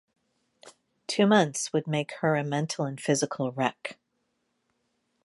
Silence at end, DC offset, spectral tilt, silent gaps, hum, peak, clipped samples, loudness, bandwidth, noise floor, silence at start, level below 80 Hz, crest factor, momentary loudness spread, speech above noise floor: 1.3 s; under 0.1%; -4.5 dB/octave; none; none; -8 dBFS; under 0.1%; -27 LUFS; 11.5 kHz; -77 dBFS; 0.65 s; -76 dBFS; 22 dB; 10 LU; 50 dB